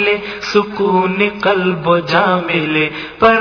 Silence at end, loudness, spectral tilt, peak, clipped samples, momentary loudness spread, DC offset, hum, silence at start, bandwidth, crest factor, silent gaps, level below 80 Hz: 0 s; -14 LUFS; -6 dB/octave; 0 dBFS; 0.1%; 3 LU; under 0.1%; none; 0 s; 5.4 kHz; 14 dB; none; -48 dBFS